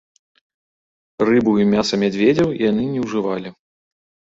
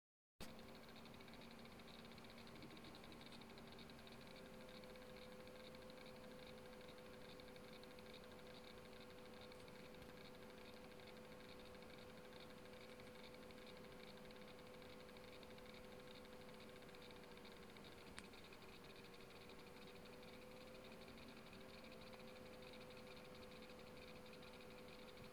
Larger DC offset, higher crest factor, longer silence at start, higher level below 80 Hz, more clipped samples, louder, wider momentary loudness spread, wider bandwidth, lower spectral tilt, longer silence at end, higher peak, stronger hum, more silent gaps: neither; second, 16 dB vs 26 dB; first, 1.2 s vs 0.4 s; first, -54 dBFS vs -74 dBFS; neither; first, -18 LUFS vs -59 LUFS; first, 8 LU vs 1 LU; second, 7.8 kHz vs 17 kHz; first, -6 dB/octave vs -4.5 dB/octave; first, 0.85 s vs 0 s; first, -4 dBFS vs -32 dBFS; neither; neither